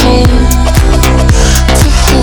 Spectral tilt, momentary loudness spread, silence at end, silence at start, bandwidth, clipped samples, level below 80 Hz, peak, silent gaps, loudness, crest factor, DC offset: -5 dB/octave; 1 LU; 0 s; 0 s; over 20 kHz; 0.4%; -8 dBFS; 0 dBFS; none; -8 LUFS; 6 dB; under 0.1%